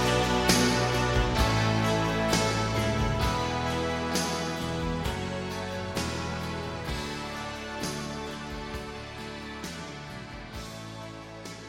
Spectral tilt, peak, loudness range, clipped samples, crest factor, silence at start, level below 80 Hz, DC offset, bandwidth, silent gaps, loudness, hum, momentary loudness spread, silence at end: -4.5 dB/octave; -6 dBFS; 11 LU; under 0.1%; 22 dB; 0 s; -40 dBFS; under 0.1%; 16.5 kHz; none; -29 LUFS; none; 15 LU; 0 s